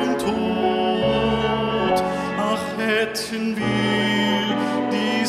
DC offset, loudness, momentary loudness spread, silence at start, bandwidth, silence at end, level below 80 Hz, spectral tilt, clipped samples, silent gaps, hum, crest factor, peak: under 0.1%; -21 LUFS; 4 LU; 0 s; 15 kHz; 0 s; -46 dBFS; -5 dB/octave; under 0.1%; none; none; 14 dB; -6 dBFS